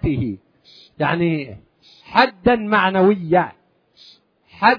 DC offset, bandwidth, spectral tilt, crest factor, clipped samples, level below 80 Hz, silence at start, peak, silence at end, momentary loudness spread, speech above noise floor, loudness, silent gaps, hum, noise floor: under 0.1%; 5.4 kHz; -8.5 dB/octave; 20 dB; under 0.1%; -44 dBFS; 0 s; 0 dBFS; 0 s; 12 LU; 33 dB; -18 LUFS; none; none; -51 dBFS